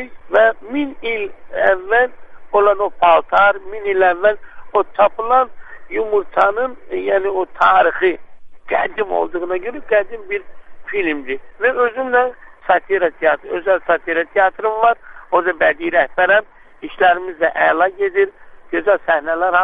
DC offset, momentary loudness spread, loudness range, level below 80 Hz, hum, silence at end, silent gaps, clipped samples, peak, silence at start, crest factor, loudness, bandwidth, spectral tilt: under 0.1%; 10 LU; 4 LU; -48 dBFS; none; 0 s; none; under 0.1%; 0 dBFS; 0 s; 16 dB; -16 LUFS; 5 kHz; -6 dB/octave